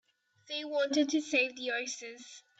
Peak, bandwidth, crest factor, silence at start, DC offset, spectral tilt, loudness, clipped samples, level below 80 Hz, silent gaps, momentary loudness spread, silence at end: -16 dBFS; 8.2 kHz; 18 dB; 0.5 s; under 0.1%; -1 dB/octave; -32 LUFS; under 0.1%; -84 dBFS; none; 13 LU; 0.2 s